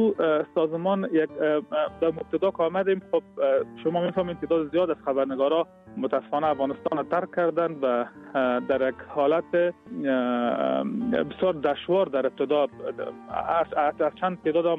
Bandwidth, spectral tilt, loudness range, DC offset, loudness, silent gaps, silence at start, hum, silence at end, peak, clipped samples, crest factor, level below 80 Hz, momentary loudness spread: 4.6 kHz; -8.5 dB/octave; 1 LU; under 0.1%; -26 LUFS; none; 0 s; none; 0 s; -12 dBFS; under 0.1%; 14 dB; -62 dBFS; 5 LU